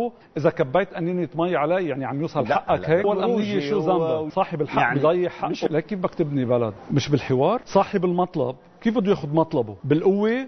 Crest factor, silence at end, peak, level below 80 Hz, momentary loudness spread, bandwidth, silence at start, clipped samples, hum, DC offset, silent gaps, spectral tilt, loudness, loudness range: 18 dB; 0 s; -4 dBFS; -56 dBFS; 6 LU; 6.4 kHz; 0 s; under 0.1%; none; under 0.1%; none; -7.5 dB/octave; -23 LUFS; 1 LU